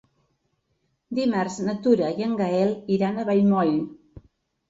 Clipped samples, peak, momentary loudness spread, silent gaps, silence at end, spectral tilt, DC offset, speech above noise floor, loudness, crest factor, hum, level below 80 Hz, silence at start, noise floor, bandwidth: under 0.1%; -6 dBFS; 7 LU; none; 0.5 s; -7 dB/octave; under 0.1%; 50 dB; -23 LUFS; 18 dB; none; -62 dBFS; 1.1 s; -72 dBFS; 7.8 kHz